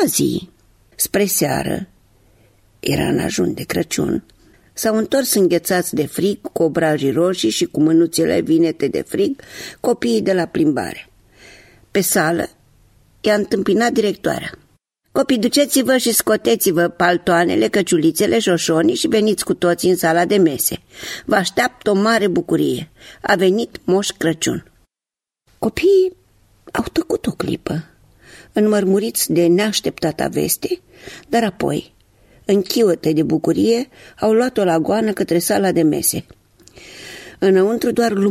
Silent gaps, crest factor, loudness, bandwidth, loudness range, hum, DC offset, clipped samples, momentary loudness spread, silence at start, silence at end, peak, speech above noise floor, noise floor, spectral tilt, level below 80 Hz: none; 16 dB; -17 LUFS; 16 kHz; 5 LU; none; under 0.1%; under 0.1%; 11 LU; 0 s; 0 s; -2 dBFS; 72 dB; -89 dBFS; -4.5 dB/octave; -50 dBFS